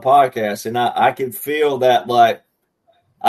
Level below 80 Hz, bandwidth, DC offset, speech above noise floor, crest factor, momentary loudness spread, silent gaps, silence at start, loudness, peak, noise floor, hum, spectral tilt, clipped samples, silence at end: -66 dBFS; 13.5 kHz; under 0.1%; 46 dB; 16 dB; 8 LU; none; 0 s; -16 LUFS; 0 dBFS; -62 dBFS; none; -4.5 dB/octave; under 0.1%; 0 s